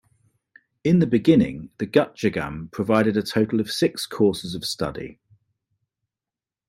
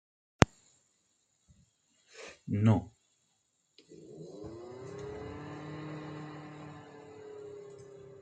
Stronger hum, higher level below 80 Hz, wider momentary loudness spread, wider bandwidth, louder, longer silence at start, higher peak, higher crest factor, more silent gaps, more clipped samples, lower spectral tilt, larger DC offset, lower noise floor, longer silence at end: neither; about the same, -54 dBFS vs -56 dBFS; second, 11 LU vs 23 LU; first, 16 kHz vs 9.2 kHz; first, -22 LUFS vs -34 LUFS; first, 0.85 s vs 0.4 s; second, -4 dBFS vs 0 dBFS; second, 18 dB vs 36 dB; neither; neither; about the same, -6 dB/octave vs -6 dB/octave; neither; first, under -90 dBFS vs -76 dBFS; first, 1.55 s vs 0 s